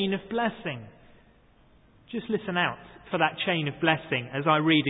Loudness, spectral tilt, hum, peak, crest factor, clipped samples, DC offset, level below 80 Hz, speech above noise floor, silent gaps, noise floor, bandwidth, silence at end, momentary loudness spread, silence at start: -27 LUFS; -10 dB/octave; none; -6 dBFS; 22 dB; under 0.1%; under 0.1%; -62 dBFS; 31 dB; none; -59 dBFS; 4 kHz; 0 s; 12 LU; 0 s